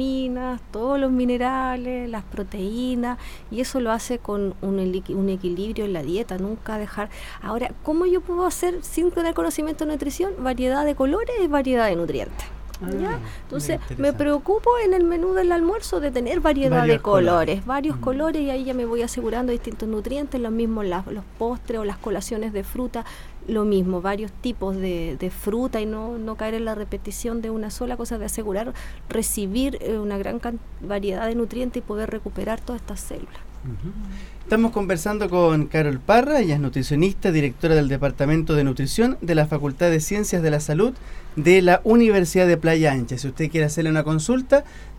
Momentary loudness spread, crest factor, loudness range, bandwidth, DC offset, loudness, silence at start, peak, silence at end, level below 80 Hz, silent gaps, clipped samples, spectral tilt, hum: 12 LU; 20 dB; 9 LU; 17 kHz; under 0.1%; -23 LUFS; 0 s; -2 dBFS; 0 s; -36 dBFS; none; under 0.1%; -6 dB/octave; 50 Hz at -40 dBFS